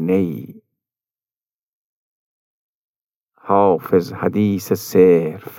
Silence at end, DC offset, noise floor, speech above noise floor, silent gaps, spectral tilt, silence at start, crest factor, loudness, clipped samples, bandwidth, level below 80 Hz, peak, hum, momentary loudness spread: 0 s; under 0.1%; under -90 dBFS; over 74 dB; 1.59-3.09 s, 3.16-3.24 s; -7 dB/octave; 0 s; 18 dB; -17 LUFS; under 0.1%; 17 kHz; -66 dBFS; -2 dBFS; none; 9 LU